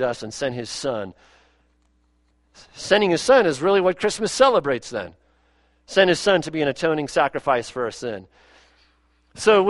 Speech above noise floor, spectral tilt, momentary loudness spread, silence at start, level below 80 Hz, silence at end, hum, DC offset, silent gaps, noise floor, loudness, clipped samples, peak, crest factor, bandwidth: 43 dB; -4 dB/octave; 15 LU; 0 s; -56 dBFS; 0 s; none; under 0.1%; none; -63 dBFS; -21 LUFS; under 0.1%; -2 dBFS; 20 dB; 11.5 kHz